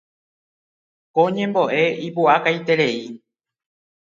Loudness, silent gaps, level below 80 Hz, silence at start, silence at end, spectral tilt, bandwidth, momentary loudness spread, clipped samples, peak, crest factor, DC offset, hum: -19 LUFS; none; -74 dBFS; 1.15 s; 0.95 s; -6 dB/octave; 7.6 kHz; 8 LU; under 0.1%; -2 dBFS; 20 dB; under 0.1%; none